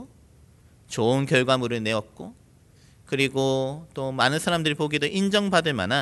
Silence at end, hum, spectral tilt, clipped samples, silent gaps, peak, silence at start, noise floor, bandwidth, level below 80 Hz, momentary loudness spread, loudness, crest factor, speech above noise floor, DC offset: 0 s; none; -4.5 dB/octave; under 0.1%; none; -4 dBFS; 0 s; -55 dBFS; 12 kHz; -58 dBFS; 11 LU; -24 LUFS; 22 dB; 31 dB; under 0.1%